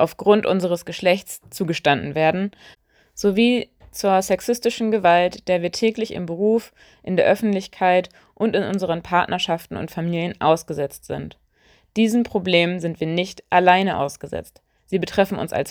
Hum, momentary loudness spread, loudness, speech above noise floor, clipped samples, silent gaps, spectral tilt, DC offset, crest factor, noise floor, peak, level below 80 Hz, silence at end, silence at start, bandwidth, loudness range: none; 12 LU; -20 LUFS; 37 dB; under 0.1%; none; -5 dB/octave; under 0.1%; 20 dB; -58 dBFS; 0 dBFS; -54 dBFS; 0 s; 0 s; over 20 kHz; 3 LU